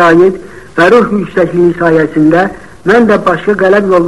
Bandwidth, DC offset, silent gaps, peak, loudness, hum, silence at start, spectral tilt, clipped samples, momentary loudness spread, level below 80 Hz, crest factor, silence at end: 11.5 kHz; 1%; none; 0 dBFS; -9 LUFS; none; 0 s; -7 dB/octave; 1%; 7 LU; -40 dBFS; 8 dB; 0 s